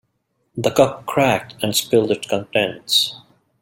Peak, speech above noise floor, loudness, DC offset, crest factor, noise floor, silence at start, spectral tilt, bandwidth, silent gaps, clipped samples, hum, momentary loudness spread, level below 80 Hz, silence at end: -2 dBFS; 51 dB; -19 LUFS; under 0.1%; 18 dB; -69 dBFS; 0.55 s; -3.5 dB/octave; 17 kHz; none; under 0.1%; none; 6 LU; -56 dBFS; 0.45 s